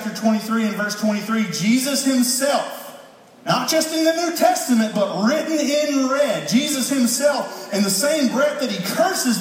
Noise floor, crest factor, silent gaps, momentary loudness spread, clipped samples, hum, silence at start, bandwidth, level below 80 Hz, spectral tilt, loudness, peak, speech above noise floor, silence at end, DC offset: -44 dBFS; 16 dB; none; 5 LU; under 0.1%; none; 0 s; 16.5 kHz; -74 dBFS; -3.5 dB/octave; -19 LUFS; -4 dBFS; 25 dB; 0 s; under 0.1%